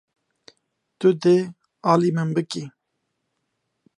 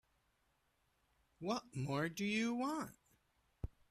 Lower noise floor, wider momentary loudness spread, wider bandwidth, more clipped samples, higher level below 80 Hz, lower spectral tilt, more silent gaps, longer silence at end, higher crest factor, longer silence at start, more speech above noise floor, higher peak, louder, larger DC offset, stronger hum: about the same, -77 dBFS vs -80 dBFS; about the same, 14 LU vs 15 LU; second, 11 kHz vs 14 kHz; neither; second, -74 dBFS vs -64 dBFS; first, -7 dB/octave vs -5 dB/octave; neither; first, 1.3 s vs 0.25 s; about the same, 20 dB vs 18 dB; second, 1 s vs 1.4 s; first, 57 dB vs 40 dB; first, -4 dBFS vs -26 dBFS; first, -21 LUFS vs -41 LUFS; neither; neither